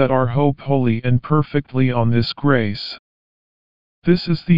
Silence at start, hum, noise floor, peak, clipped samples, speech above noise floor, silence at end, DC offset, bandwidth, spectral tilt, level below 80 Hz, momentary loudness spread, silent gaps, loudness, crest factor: 0 s; none; under -90 dBFS; -2 dBFS; under 0.1%; over 73 dB; 0 s; 2%; 5.4 kHz; -6.5 dB/octave; -46 dBFS; 8 LU; 2.99-4.02 s; -19 LUFS; 16 dB